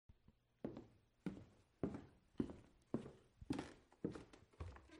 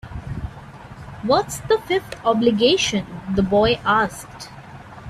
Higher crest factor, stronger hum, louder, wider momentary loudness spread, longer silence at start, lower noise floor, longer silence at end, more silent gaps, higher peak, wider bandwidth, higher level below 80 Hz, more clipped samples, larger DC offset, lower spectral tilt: first, 26 dB vs 18 dB; neither; second, -52 LUFS vs -19 LUFS; second, 16 LU vs 22 LU; about the same, 0.1 s vs 0.05 s; first, -75 dBFS vs -39 dBFS; about the same, 0 s vs 0 s; neither; second, -26 dBFS vs -4 dBFS; second, 11 kHz vs 14.5 kHz; second, -68 dBFS vs -42 dBFS; neither; neither; first, -7.5 dB/octave vs -4.5 dB/octave